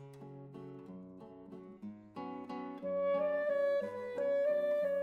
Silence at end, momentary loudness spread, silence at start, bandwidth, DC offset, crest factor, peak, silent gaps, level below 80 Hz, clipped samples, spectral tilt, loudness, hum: 0 s; 19 LU; 0 s; 5.2 kHz; under 0.1%; 12 dB; -26 dBFS; none; -80 dBFS; under 0.1%; -7.5 dB/octave; -35 LUFS; none